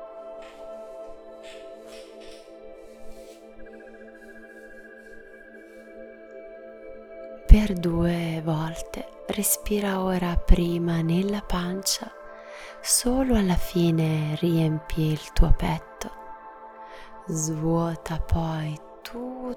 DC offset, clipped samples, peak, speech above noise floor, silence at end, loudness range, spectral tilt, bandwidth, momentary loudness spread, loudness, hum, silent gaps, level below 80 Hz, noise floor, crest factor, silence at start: under 0.1%; under 0.1%; 0 dBFS; 23 dB; 0 s; 20 LU; -5 dB/octave; 19.5 kHz; 23 LU; -25 LUFS; none; none; -30 dBFS; -46 dBFS; 26 dB; 0 s